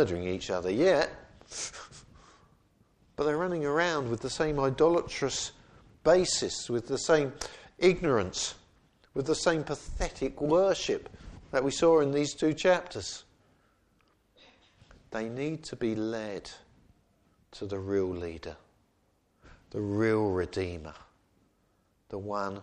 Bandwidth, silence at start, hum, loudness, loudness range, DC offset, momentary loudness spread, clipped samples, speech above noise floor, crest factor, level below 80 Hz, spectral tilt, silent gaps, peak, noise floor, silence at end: 10.5 kHz; 0 s; none; -29 LUFS; 9 LU; under 0.1%; 17 LU; under 0.1%; 42 dB; 20 dB; -52 dBFS; -4.5 dB/octave; none; -10 dBFS; -71 dBFS; 0 s